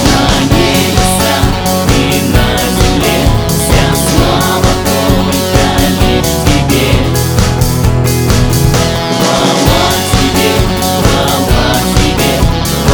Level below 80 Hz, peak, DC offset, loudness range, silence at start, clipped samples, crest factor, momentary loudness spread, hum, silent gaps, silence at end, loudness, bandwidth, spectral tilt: -18 dBFS; 0 dBFS; under 0.1%; 0 LU; 0 s; 0.5%; 10 dB; 2 LU; none; none; 0 s; -10 LUFS; over 20 kHz; -4.5 dB/octave